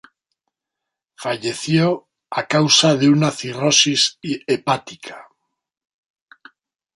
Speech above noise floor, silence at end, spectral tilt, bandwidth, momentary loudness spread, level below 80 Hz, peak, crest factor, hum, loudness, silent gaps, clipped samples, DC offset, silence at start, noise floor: 65 dB; 1.75 s; -3.5 dB/octave; 11.5 kHz; 15 LU; -62 dBFS; -2 dBFS; 20 dB; none; -17 LUFS; none; under 0.1%; under 0.1%; 1.2 s; -83 dBFS